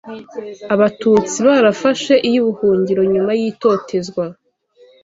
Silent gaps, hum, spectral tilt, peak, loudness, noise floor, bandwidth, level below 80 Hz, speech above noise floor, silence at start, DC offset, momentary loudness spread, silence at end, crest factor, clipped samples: none; none; -5 dB/octave; 0 dBFS; -15 LUFS; -50 dBFS; 7.8 kHz; -56 dBFS; 35 dB; 0.05 s; under 0.1%; 14 LU; 0.7 s; 14 dB; under 0.1%